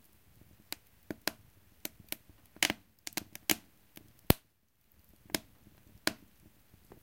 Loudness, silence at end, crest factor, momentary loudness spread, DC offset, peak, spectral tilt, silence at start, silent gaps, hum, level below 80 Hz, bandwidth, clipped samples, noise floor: -36 LUFS; 0.9 s; 38 dB; 20 LU; under 0.1%; -4 dBFS; -3 dB/octave; 1.1 s; none; none; -54 dBFS; 17 kHz; under 0.1%; -73 dBFS